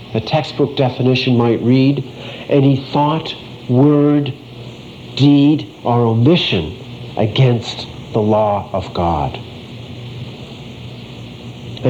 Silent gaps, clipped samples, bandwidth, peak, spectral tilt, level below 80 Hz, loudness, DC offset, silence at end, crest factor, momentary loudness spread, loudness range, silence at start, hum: none; under 0.1%; 8 kHz; -2 dBFS; -8 dB/octave; -44 dBFS; -15 LUFS; under 0.1%; 0 s; 14 dB; 20 LU; 6 LU; 0 s; none